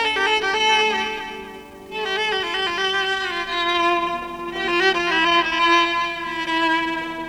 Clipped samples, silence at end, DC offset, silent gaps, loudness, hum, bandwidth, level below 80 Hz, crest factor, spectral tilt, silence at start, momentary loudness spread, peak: under 0.1%; 0 s; under 0.1%; none; -20 LUFS; 50 Hz at -55 dBFS; 16.5 kHz; -52 dBFS; 16 dB; -2 dB/octave; 0 s; 12 LU; -6 dBFS